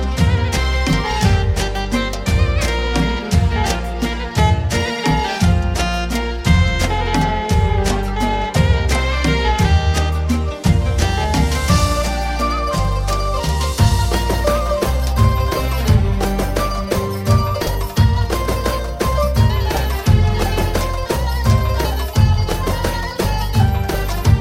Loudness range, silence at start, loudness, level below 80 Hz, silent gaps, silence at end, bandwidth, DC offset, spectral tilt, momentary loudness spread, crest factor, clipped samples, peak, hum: 1 LU; 0 s; -17 LUFS; -20 dBFS; none; 0 s; 16.5 kHz; under 0.1%; -5.5 dB/octave; 5 LU; 14 dB; under 0.1%; -2 dBFS; none